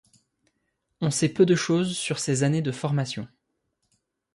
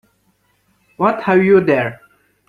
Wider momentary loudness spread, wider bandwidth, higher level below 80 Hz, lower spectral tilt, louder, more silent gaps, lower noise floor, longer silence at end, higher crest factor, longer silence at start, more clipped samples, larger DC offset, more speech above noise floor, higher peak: first, 10 LU vs 7 LU; first, 11.5 kHz vs 4.9 kHz; second, -64 dBFS vs -58 dBFS; second, -5 dB/octave vs -8.5 dB/octave; second, -24 LUFS vs -15 LUFS; neither; first, -76 dBFS vs -61 dBFS; first, 1.1 s vs 0.55 s; about the same, 20 dB vs 16 dB; about the same, 1 s vs 1 s; neither; neither; first, 52 dB vs 48 dB; second, -6 dBFS vs -2 dBFS